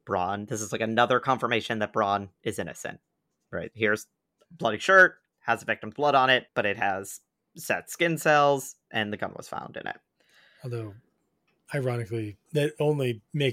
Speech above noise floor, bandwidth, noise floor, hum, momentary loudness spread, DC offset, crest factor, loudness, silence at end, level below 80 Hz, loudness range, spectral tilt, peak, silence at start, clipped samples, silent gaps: 47 dB; 16.5 kHz; -73 dBFS; none; 16 LU; under 0.1%; 22 dB; -26 LUFS; 0 s; -70 dBFS; 11 LU; -4.5 dB/octave; -6 dBFS; 0.05 s; under 0.1%; none